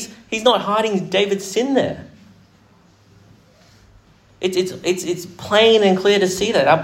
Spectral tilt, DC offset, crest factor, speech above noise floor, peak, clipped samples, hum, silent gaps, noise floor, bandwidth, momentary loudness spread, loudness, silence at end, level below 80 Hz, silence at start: -4 dB/octave; under 0.1%; 18 dB; 35 dB; 0 dBFS; under 0.1%; none; none; -52 dBFS; 16 kHz; 12 LU; -18 LUFS; 0 s; -56 dBFS; 0 s